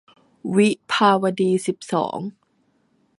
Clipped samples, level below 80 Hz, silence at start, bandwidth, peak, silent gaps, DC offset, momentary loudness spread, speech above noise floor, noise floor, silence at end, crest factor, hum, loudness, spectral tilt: under 0.1%; -70 dBFS; 0.45 s; 11.5 kHz; -2 dBFS; none; under 0.1%; 14 LU; 45 dB; -65 dBFS; 0.9 s; 20 dB; none; -20 LUFS; -5.5 dB/octave